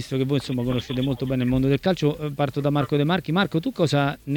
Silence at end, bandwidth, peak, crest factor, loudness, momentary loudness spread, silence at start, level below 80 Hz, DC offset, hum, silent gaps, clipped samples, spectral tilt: 0 s; 18 kHz; -6 dBFS; 16 dB; -23 LUFS; 4 LU; 0 s; -46 dBFS; under 0.1%; none; none; under 0.1%; -7 dB/octave